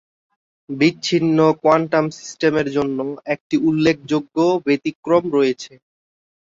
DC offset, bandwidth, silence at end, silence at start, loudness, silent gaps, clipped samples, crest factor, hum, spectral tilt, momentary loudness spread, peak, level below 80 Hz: under 0.1%; 7.8 kHz; 0.8 s; 0.7 s; -18 LUFS; 3.41-3.50 s, 4.95-5.03 s; under 0.1%; 18 dB; none; -6 dB/octave; 10 LU; -2 dBFS; -58 dBFS